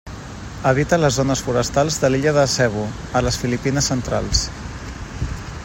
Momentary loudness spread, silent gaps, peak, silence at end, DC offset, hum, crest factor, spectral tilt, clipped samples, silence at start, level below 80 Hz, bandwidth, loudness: 15 LU; none; -2 dBFS; 0 s; under 0.1%; none; 18 dB; -4.5 dB/octave; under 0.1%; 0.05 s; -34 dBFS; 16.5 kHz; -19 LUFS